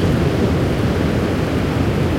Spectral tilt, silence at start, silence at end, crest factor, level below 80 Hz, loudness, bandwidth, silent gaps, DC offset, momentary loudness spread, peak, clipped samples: -7 dB/octave; 0 s; 0 s; 12 dB; -30 dBFS; -18 LUFS; 16.5 kHz; none; under 0.1%; 2 LU; -4 dBFS; under 0.1%